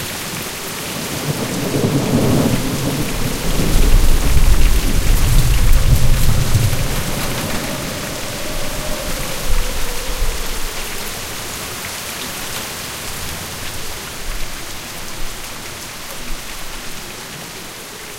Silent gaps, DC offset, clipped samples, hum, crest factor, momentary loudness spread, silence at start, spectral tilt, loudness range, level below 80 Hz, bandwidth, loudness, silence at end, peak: none; under 0.1%; under 0.1%; none; 16 dB; 11 LU; 0 s; -4 dB/octave; 10 LU; -18 dBFS; 16.5 kHz; -20 LUFS; 0 s; 0 dBFS